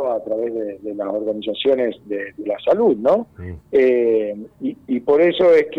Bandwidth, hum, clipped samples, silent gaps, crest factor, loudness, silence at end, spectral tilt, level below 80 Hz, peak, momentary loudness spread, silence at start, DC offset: 6.2 kHz; none; under 0.1%; none; 12 dB; -19 LUFS; 0 s; -7 dB/octave; -54 dBFS; -6 dBFS; 13 LU; 0 s; under 0.1%